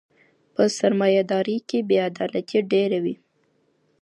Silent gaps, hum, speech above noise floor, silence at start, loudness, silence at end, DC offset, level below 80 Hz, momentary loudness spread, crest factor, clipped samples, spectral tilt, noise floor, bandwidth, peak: none; none; 45 dB; 0.6 s; -22 LUFS; 0.9 s; under 0.1%; -72 dBFS; 8 LU; 16 dB; under 0.1%; -5.5 dB/octave; -66 dBFS; 11.5 kHz; -6 dBFS